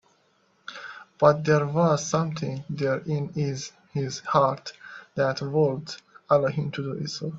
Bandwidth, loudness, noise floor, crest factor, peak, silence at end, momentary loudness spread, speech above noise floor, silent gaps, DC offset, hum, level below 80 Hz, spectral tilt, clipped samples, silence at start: 7.8 kHz; -25 LUFS; -65 dBFS; 22 dB; -4 dBFS; 0 s; 18 LU; 41 dB; none; under 0.1%; none; -64 dBFS; -6 dB/octave; under 0.1%; 0.7 s